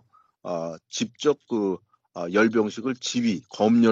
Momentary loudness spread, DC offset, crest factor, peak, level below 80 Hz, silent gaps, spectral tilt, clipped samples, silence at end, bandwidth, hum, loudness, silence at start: 13 LU; under 0.1%; 18 dB; -6 dBFS; -70 dBFS; none; -5 dB/octave; under 0.1%; 0 s; 7.8 kHz; none; -25 LUFS; 0.45 s